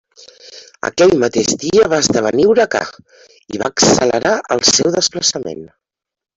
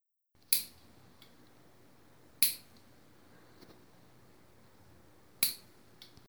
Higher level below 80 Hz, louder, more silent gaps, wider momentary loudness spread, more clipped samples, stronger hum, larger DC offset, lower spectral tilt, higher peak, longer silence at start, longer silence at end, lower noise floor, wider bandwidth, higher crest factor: first, -50 dBFS vs -76 dBFS; first, -14 LUFS vs -31 LUFS; neither; second, 13 LU vs 22 LU; neither; neither; neither; first, -3 dB/octave vs 1 dB/octave; first, 0 dBFS vs -6 dBFS; about the same, 0.45 s vs 0.5 s; about the same, 0.7 s vs 0.7 s; second, -41 dBFS vs -69 dBFS; second, 8.2 kHz vs over 20 kHz; second, 16 dB vs 34 dB